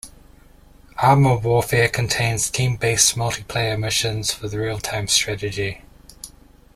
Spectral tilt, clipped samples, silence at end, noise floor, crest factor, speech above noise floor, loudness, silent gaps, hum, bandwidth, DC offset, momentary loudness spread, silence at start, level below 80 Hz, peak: -3.5 dB/octave; under 0.1%; 0.5 s; -48 dBFS; 20 dB; 28 dB; -19 LUFS; none; none; 16 kHz; under 0.1%; 22 LU; 0.05 s; -44 dBFS; 0 dBFS